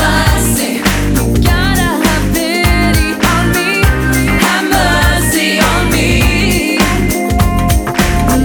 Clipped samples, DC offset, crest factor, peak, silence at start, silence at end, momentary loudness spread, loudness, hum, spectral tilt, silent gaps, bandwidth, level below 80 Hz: under 0.1%; under 0.1%; 10 dB; 0 dBFS; 0 s; 0 s; 3 LU; -11 LUFS; none; -4.5 dB/octave; none; over 20 kHz; -18 dBFS